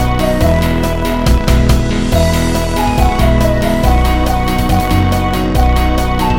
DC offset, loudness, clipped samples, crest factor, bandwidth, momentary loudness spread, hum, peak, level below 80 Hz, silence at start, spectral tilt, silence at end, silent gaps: 3%; -13 LUFS; under 0.1%; 12 dB; 17 kHz; 3 LU; none; 0 dBFS; -14 dBFS; 0 s; -6 dB/octave; 0 s; none